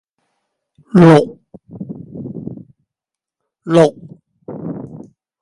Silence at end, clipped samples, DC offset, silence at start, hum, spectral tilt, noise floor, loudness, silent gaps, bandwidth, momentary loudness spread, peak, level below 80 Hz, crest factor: 0.55 s; under 0.1%; under 0.1%; 0.95 s; none; -8 dB/octave; -85 dBFS; -12 LUFS; none; 11 kHz; 25 LU; 0 dBFS; -56 dBFS; 18 dB